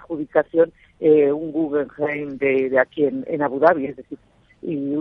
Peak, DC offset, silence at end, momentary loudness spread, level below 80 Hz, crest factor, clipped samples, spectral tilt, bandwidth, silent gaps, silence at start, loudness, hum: -2 dBFS; under 0.1%; 0 s; 13 LU; -60 dBFS; 18 dB; under 0.1%; -9.5 dB/octave; 5.2 kHz; none; 0.1 s; -20 LUFS; none